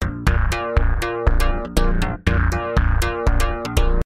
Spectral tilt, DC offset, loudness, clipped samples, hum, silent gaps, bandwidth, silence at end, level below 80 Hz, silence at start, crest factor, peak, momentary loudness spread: -6 dB/octave; under 0.1%; -21 LUFS; under 0.1%; none; none; 15.5 kHz; 0.05 s; -20 dBFS; 0 s; 16 dB; -2 dBFS; 3 LU